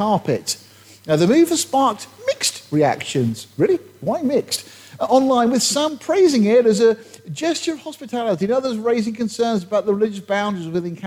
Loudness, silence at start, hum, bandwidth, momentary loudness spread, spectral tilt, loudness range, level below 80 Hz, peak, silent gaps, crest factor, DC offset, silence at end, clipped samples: -19 LUFS; 0 s; none; 17 kHz; 11 LU; -4.5 dB/octave; 4 LU; -64 dBFS; -4 dBFS; none; 14 dB; under 0.1%; 0 s; under 0.1%